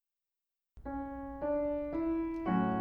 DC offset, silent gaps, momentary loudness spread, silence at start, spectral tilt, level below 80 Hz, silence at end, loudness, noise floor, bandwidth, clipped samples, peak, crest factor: under 0.1%; none; 10 LU; 0.75 s; -10 dB/octave; -54 dBFS; 0 s; -36 LUFS; under -90 dBFS; 4.6 kHz; under 0.1%; -20 dBFS; 16 dB